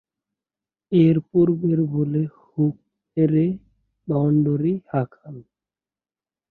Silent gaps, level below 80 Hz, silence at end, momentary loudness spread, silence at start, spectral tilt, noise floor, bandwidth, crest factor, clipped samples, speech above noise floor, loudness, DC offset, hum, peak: none; -58 dBFS; 1.1 s; 14 LU; 0.9 s; -12.5 dB/octave; under -90 dBFS; 4.1 kHz; 16 dB; under 0.1%; over 70 dB; -21 LUFS; under 0.1%; none; -6 dBFS